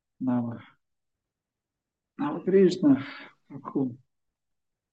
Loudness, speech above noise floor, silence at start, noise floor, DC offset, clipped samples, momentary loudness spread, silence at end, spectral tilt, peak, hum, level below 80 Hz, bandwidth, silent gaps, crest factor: -26 LUFS; 63 dB; 0.2 s; -88 dBFS; under 0.1%; under 0.1%; 22 LU; 0.95 s; -8 dB/octave; -10 dBFS; none; -74 dBFS; 8.2 kHz; none; 18 dB